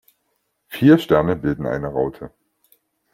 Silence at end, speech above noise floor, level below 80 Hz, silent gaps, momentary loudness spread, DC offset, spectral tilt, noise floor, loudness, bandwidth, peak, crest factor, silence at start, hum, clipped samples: 0.85 s; 53 dB; -48 dBFS; none; 22 LU; under 0.1%; -8 dB/octave; -71 dBFS; -18 LUFS; 16 kHz; -2 dBFS; 18 dB; 0.7 s; none; under 0.1%